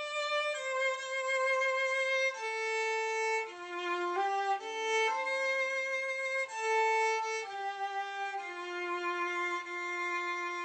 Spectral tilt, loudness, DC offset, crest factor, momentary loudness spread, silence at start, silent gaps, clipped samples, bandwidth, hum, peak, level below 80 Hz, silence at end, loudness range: 0 dB/octave; -33 LUFS; under 0.1%; 12 dB; 7 LU; 0 s; none; under 0.1%; 9 kHz; none; -20 dBFS; under -90 dBFS; 0 s; 3 LU